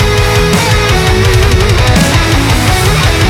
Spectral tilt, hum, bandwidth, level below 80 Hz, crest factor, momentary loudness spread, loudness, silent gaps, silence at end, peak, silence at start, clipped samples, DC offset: -4.5 dB/octave; none; 17.5 kHz; -14 dBFS; 8 dB; 1 LU; -9 LUFS; none; 0 s; 0 dBFS; 0 s; under 0.1%; under 0.1%